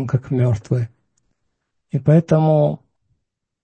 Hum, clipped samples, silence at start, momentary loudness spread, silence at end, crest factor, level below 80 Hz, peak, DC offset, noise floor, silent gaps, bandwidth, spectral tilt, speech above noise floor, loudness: none; under 0.1%; 0 s; 13 LU; 0.85 s; 16 dB; -52 dBFS; -2 dBFS; under 0.1%; -76 dBFS; none; 8 kHz; -9.5 dB/octave; 59 dB; -18 LUFS